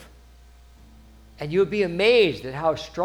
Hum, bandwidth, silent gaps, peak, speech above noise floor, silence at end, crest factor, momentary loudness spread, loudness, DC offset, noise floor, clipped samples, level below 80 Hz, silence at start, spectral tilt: 60 Hz at -50 dBFS; 14 kHz; none; -8 dBFS; 28 dB; 0 s; 18 dB; 9 LU; -22 LUFS; under 0.1%; -49 dBFS; under 0.1%; -50 dBFS; 0 s; -5.5 dB/octave